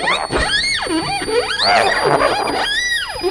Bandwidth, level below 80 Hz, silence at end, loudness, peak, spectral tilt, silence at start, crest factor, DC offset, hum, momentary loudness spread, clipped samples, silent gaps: 11 kHz; -36 dBFS; 0 s; -16 LUFS; 0 dBFS; -2.5 dB/octave; 0 s; 16 dB; under 0.1%; none; 5 LU; under 0.1%; none